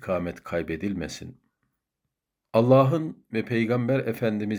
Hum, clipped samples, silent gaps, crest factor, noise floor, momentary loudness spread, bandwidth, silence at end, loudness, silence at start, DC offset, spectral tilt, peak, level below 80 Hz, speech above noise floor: none; under 0.1%; none; 20 dB; -83 dBFS; 14 LU; over 20 kHz; 0 s; -25 LUFS; 0 s; under 0.1%; -7.5 dB/octave; -6 dBFS; -60 dBFS; 59 dB